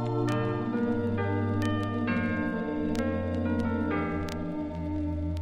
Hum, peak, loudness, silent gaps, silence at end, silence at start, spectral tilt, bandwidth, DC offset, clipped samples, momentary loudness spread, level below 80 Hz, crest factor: none; -16 dBFS; -30 LUFS; none; 0 s; 0 s; -8 dB/octave; 10.5 kHz; under 0.1%; under 0.1%; 4 LU; -48 dBFS; 14 dB